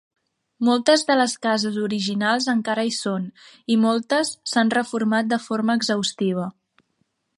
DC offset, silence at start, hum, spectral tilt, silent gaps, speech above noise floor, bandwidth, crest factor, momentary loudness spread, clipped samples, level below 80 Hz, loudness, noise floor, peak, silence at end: under 0.1%; 0.6 s; none; -4 dB/octave; none; 50 dB; 11.5 kHz; 18 dB; 7 LU; under 0.1%; -72 dBFS; -21 LUFS; -71 dBFS; -4 dBFS; 0.9 s